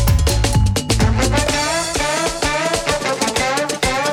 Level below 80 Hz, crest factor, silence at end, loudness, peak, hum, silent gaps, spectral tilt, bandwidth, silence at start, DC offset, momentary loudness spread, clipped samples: -24 dBFS; 12 dB; 0 s; -17 LUFS; -4 dBFS; none; none; -4 dB/octave; 18.5 kHz; 0 s; under 0.1%; 3 LU; under 0.1%